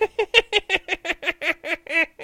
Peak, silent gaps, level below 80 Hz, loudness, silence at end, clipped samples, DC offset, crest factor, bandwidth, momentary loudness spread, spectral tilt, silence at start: 0 dBFS; none; -52 dBFS; -21 LUFS; 0 s; under 0.1%; under 0.1%; 24 dB; 16.5 kHz; 8 LU; -1.5 dB/octave; 0 s